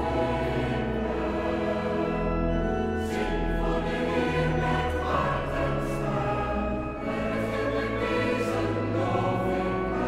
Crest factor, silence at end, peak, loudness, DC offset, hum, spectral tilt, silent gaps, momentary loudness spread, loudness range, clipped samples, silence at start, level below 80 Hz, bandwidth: 14 dB; 0 s; -14 dBFS; -28 LUFS; under 0.1%; none; -7 dB/octave; none; 3 LU; 1 LU; under 0.1%; 0 s; -36 dBFS; 15.5 kHz